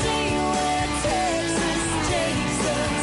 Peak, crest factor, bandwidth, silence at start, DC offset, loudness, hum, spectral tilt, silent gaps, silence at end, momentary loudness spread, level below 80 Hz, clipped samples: -12 dBFS; 10 dB; 11.5 kHz; 0 s; under 0.1%; -23 LUFS; none; -3.5 dB/octave; none; 0 s; 1 LU; -38 dBFS; under 0.1%